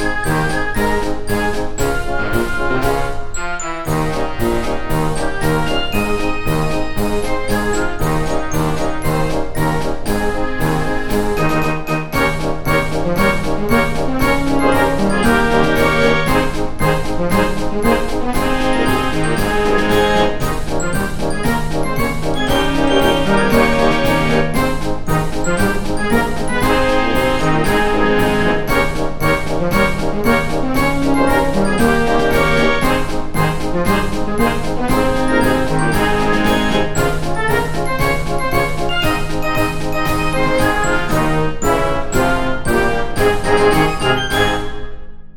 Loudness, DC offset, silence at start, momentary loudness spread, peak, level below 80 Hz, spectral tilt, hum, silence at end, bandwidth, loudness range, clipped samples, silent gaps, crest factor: -17 LUFS; under 0.1%; 0 s; 6 LU; 0 dBFS; -24 dBFS; -5 dB/octave; none; 0.05 s; 17.5 kHz; 4 LU; under 0.1%; none; 14 dB